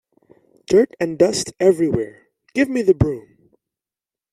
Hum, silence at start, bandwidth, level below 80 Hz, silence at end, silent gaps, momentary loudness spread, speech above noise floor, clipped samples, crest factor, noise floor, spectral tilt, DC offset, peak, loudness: none; 0.7 s; 13 kHz; -44 dBFS; 1.15 s; none; 9 LU; over 73 dB; under 0.1%; 18 dB; under -90 dBFS; -6 dB/octave; under 0.1%; -2 dBFS; -18 LUFS